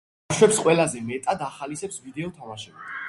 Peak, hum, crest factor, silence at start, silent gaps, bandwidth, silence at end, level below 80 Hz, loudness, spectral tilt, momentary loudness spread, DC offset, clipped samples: -2 dBFS; none; 22 dB; 0.3 s; none; 11.5 kHz; 0 s; -60 dBFS; -23 LUFS; -4 dB/octave; 18 LU; under 0.1%; under 0.1%